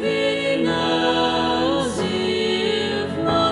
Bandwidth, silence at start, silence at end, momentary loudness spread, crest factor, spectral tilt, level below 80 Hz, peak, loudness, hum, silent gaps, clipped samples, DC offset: 11.5 kHz; 0 s; 0 s; 3 LU; 14 dB; -4.5 dB/octave; -50 dBFS; -6 dBFS; -20 LUFS; none; none; under 0.1%; under 0.1%